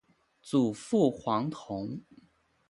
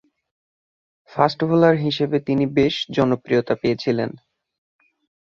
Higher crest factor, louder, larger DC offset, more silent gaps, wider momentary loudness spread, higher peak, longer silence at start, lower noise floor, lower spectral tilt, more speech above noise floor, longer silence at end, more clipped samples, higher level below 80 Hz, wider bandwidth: about the same, 20 dB vs 20 dB; second, -30 LUFS vs -20 LUFS; neither; neither; first, 11 LU vs 6 LU; second, -12 dBFS vs -2 dBFS; second, 0.45 s vs 1.15 s; second, -67 dBFS vs under -90 dBFS; about the same, -7 dB/octave vs -7 dB/octave; second, 37 dB vs over 71 dB; second, 0.7 s vs 1.1 s; neither; second, -68 dBFS vs -56 dBFS; first, 11.5 kHz vs 7.2 kHz